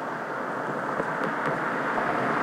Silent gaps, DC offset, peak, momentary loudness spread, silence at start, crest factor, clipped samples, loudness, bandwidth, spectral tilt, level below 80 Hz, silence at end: none; under 0.1%; -12 dBFS; 5 LU; 0 s; 16 dB; under 0.1%; -28 LUFS; 16.5 kHz; -6 dB/octave; -66 dBFS; 0 s